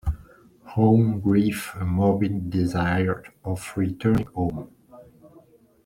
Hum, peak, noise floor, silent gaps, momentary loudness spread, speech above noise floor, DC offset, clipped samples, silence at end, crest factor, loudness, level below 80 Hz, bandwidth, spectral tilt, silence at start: none; -6 dBFS; -54 dBFS; none; 13 LU; 32 dB; under 0.1%; under 0.1%; 0.6 s; 18 dB; -24 LUFS; -42 dBFS; 16 kHz; -7.5 dB/octave; 0.05 s